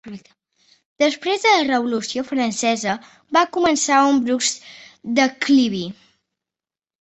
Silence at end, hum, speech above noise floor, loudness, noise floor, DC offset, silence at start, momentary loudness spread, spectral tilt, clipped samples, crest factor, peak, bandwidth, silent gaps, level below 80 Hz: 1.1 s; none; over 71 dB; -19 LUFS; under -90 dBFS; under 0.1%; 0.05 s; 13 LU; -2.5 dB/octave; under 0.1%; 18 dB; -2 dBFS; 8.4 kHz; 0.85-0.96 s; -62 dBFS